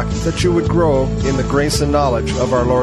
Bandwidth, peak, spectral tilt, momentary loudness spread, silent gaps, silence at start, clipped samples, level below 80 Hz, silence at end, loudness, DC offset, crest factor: 13 kHz; -2 dBFS; -6 dB/octave; 3 LU; none; 0 s; under 0.1%; -26 dBFS; 0 s; -16 LUFS; under 0.1%; 12 dB